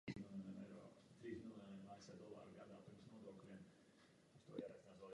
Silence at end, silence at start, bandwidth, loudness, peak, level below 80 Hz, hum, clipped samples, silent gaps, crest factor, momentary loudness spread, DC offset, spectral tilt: 0 s; 0.05 s; 11 kHz; -58 LUFS; -34 dBFS; -82 dBFS; none; under 0.1%; none; 24 dB; 8 LU; under 0.1%; -6.5 dB/octave